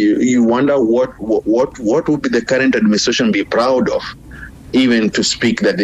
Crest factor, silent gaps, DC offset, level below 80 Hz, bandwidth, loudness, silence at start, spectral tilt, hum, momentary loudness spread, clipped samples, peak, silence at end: 8 dB; none; under 0.1%; -44 dBFS; 9.8 kHz; -14 LUFS; 0 s; -4.5 dB/octave; none; 6 LU; under 0.1%; -6 dBFS; 0 s